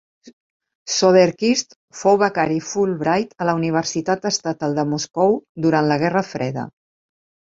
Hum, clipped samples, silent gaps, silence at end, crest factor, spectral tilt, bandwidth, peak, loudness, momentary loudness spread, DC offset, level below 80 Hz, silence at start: none; under 0.1%; 0.33-0.60 s, 0.75-0.86 s, 1.76-1.88 s, 5.49-5.55 s; 0.85 s; 18 dB; -4.5 dB/octave; 7.8 kHz; -2 dBFS; -19 LUFS; 10 LU; under 0.1%; -60 dBFS; 0.25 s